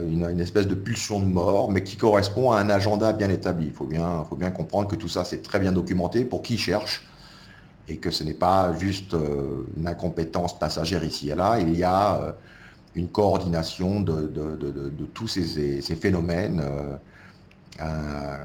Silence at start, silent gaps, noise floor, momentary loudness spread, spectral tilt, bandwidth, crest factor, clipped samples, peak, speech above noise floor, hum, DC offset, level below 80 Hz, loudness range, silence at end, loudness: 0 s; none; -50 dBFS; 10 LU; -6 dB/octave; 17 kHz; 20 dB; under 0.1%; -6 dBFS; 25 dB; none; under 0.1%; -44 dBFS; 5 LU; 0 s; -25 LUFS